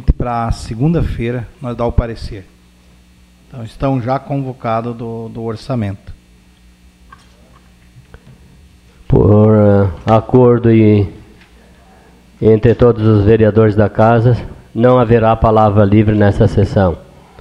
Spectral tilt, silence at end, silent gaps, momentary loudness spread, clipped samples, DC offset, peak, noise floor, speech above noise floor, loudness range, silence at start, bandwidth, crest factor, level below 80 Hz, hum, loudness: -9.5 dB/octave; 0.4 s; none; 15 LU; under 0.1%; under 0.1%; 0 dBFS; -46 dBFS; 34 dB; 13 LU; 0 s; 9 kHz; 14 dB; -28 dBFS; none; -12 LUFS